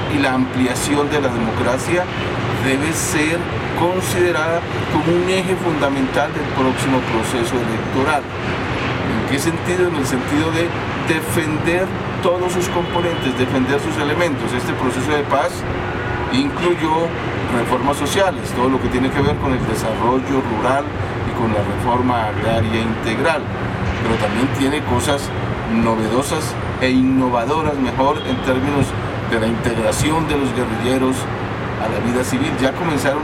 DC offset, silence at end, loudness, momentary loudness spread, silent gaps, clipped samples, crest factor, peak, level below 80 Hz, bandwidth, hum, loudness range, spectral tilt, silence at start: under 0.1%; 0 s; -18 LUFS; 4 LU; none; under 0.1%; 16 dB; -2 dBFS; -36 dBFS; 16.5 kHz; none; 1 LU; -5.5 dB/octave; 0 s